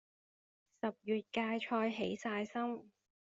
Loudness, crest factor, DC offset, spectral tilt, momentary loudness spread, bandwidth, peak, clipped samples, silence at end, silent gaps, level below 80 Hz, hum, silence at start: -39 LUFS; 18 dB; under 0.1%; -3.5 dB/octave; 7 LU; 7.6 kHz; -22 dBFS; under 0.1%; 0.45 s; none; -80 dBFS; none; 0.85 s